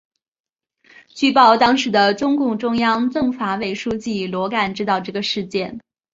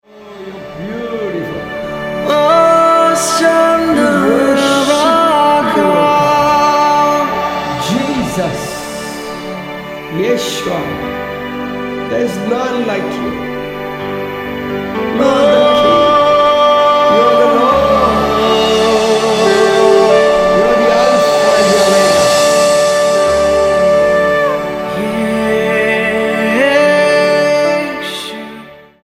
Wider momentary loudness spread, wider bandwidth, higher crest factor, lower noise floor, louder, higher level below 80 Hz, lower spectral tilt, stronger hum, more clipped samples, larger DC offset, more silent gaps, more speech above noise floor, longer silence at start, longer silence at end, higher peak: about the same, 11 LU vs 13 LU; second, 7.8 kHz vs 16 kHz; first, 18 dB vs 12 dB; first, under -90 dBFS vs -34 dBFS; second, -18 LUFS vs -11 LUFS; second, -56 dBFS vs -40 dBFS; about the same, -4.5 dB/octave vs -4 dB/octave; neither; neither; neither; neither; first, over 72 dB vs 19 dB; first, 1.15 s vs 0.15 s; about the same, 0.35 s vs 0.3 s; about the same, -2 dBFS vs 0 dBFS